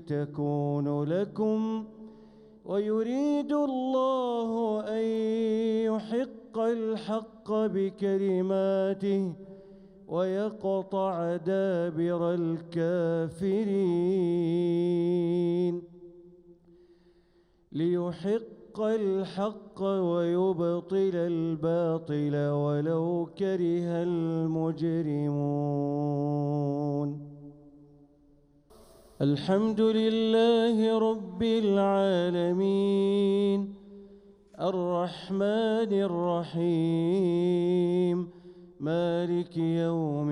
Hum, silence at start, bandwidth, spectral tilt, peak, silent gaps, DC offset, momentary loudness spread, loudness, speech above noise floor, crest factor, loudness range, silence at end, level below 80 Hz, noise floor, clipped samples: none; 0 s; 10.5 kHz; -8.5 dB/octave; -14 dBFS; none; under 0.1%; 7 LU; -28 LUFS; 37 dB; 14 dB; 6 LU; 0 s; -68 dBFS; -64 dBFS; under 0.1%